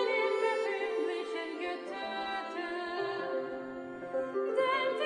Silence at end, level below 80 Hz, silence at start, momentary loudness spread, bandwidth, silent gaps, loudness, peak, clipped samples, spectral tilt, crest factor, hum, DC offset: 0 s; -74 dBFS; 0 s; 8 LU; 10.5 kHz; none; -34 LUFS; -18 dBFS; under 0.1%; -4 dB/octave; 16 dB; none; under 0.1%